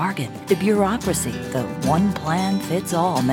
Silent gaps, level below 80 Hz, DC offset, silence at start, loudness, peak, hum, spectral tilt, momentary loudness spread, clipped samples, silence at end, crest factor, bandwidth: none; -46 dBFS; under 0.1%; 0 s; -21 LUFS; -6 dBFS; none; -5.5 dB/octave; 6 LU; under 0.1%; 0 s; 16 dB; 18 kHz